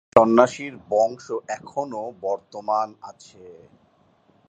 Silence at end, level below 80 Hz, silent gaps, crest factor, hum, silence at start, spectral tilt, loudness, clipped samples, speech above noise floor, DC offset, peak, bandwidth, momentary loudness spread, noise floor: 0.95 s; -62 dBFS; none; 24 dB; none; 0.15 s; -5.5 dB/octave; -23 LUFS; under 0.1%; 37 dB; under 0.1%; 0 dBFS; 9 kHz; 15 LU; -60 dBFS